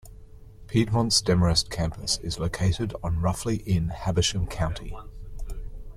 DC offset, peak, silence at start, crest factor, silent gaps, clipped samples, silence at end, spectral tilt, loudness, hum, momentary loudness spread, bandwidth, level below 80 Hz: under 0.1%; -8 dBFS; 0.05 s; 18 dB; none; under 0.1%; 0 s; -4.5 dB/octave; -25 LUFS; none; 19 LU; 14.5 kHz; -38 dBFS